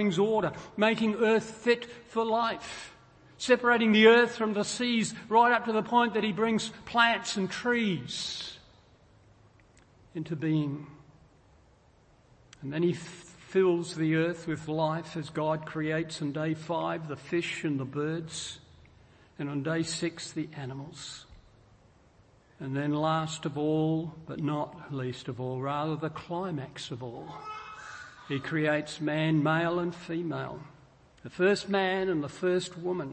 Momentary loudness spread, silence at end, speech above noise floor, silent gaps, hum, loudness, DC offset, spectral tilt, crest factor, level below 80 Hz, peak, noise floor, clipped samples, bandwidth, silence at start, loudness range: 16 LU; 0 s; 32 dB; none; none; -29 LUFS; under 0.1%; -5 dB/octave; 22 dB; -66 dBFS; -8 dBFS; -61 dBFS; under 0.1%; 8.8 kHz; 0 s; 11 LU